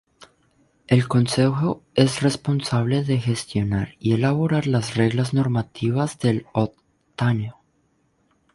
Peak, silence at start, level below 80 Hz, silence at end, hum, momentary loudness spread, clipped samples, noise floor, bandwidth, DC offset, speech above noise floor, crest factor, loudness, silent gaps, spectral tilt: -2 dBFS; 0.9 s; -50 dBFS; 1.05 s; none; 6 LU; under 0.1%; -65 dBFS; 11.5 kHz; under 0.1%; 45 dB; 20 dB; -22 LUFS; none; -6.5 dB/octave